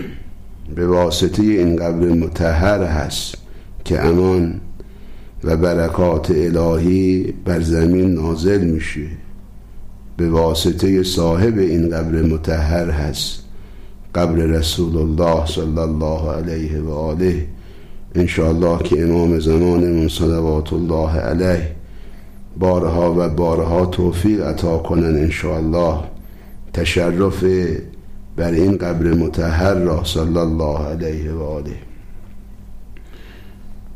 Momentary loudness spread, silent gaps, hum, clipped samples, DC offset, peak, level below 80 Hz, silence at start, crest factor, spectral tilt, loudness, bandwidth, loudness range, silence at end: 10 LU; none; none; under 0.1%; 0.7%; -6 dBFS; -28 dBFS; 0 s; 12 dB; -6.5 dB/octave; -17 LUFS; 15.5 kHz; 3 LU; 0 s